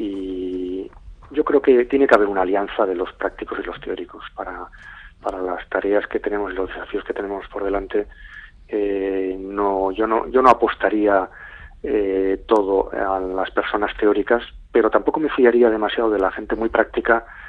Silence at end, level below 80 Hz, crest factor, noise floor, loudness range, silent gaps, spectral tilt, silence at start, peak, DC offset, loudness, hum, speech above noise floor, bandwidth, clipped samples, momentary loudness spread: 0 s; -44 dBFS; 20 dB; -40 dBFS; 7 LU; none; -6.5 dB/octave; 0 s; 0 dBFS; under 0.1%; -20 LUFS; none; 20 dB; 7.6 kHz; under 0.1%; 16 LU